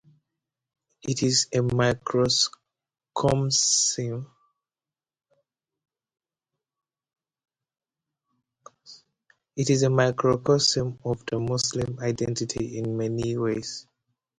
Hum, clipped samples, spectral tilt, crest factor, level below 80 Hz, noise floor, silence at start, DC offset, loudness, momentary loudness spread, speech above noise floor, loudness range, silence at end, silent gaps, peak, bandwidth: none; under 0.1%; -4 dB/octave; 20 dB; -56 dBFS; under -90 dBFS; 1.05 s; under 0.1%; -24 LUFS; 11 LU; over 66 dB; 6 LU; 0.6 s; none; -6 dBFS; 11 kHz